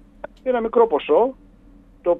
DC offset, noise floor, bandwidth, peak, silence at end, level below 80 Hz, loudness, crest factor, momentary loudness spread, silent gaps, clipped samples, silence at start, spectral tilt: under 0.1%; -48 dBFS; 3.9 kHz; -4 dBFS; 0 s; -50 dBFS; -20 LUFS; 16 dB; 11 LU; none; under 0.1%; 0.25 s; -7.5 dB/octave